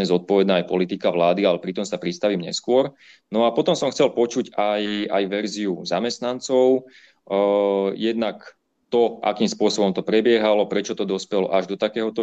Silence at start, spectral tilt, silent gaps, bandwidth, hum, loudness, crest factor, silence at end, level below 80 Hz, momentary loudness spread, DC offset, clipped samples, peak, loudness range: 0 s; -5 dB/octave; none; 8.6 kHz; none; -21 LUFS; 16 dB; 0 s; -68 dBFS; 7 LU; under 0.1%; under 0.1%; -6 dBFS; 1 LU